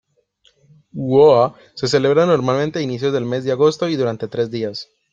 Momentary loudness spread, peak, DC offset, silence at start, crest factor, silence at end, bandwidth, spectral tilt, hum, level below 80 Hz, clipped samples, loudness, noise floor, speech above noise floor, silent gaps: 13 LU; -2 dBFS; under 0.1%; 0.95 s; 16 dB; 0.3 s; 7.8 kHz; -6 dB/octave; none; -58 dBFS; under 0.1%; -17 LUFS; -59 dBFS; 43 dB; none